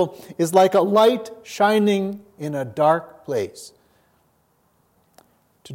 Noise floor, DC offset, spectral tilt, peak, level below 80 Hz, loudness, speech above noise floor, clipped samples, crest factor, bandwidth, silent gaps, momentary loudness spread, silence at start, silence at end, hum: -63 dBFS; under 0.1%; -5.5 dB/octave; -2 dBFS; -72 dBFS; -20 LUFS; 44 dB; under 0.1%; 18 dB; 16.5 kHz; none; 15 LU; 0 s; 0 s; none